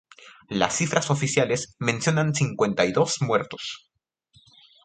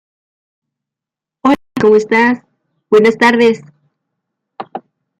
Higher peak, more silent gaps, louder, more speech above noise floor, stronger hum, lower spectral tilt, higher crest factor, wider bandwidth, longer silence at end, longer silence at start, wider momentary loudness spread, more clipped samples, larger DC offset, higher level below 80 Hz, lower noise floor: second, -4 dBFS vs 0 dBFS; neither; second, -24 LUFS vs -12 LUFS; second, 39 dB vs 76 dB; neither; about the same, -4.5 dB/octave vs -5.5 dB/octave; first, 22 dB vs 16 dB; second, 9.6 kHz vs 11 kHz; first, 1.05 s vs 0.4 s; second, 0.2 s vs 1.45 s; second, 10 LU vs 19 LU; neither; neither; about the same, -60 dBFS vs -58 dBFS; second, -62 dBFS vs -86 dBFS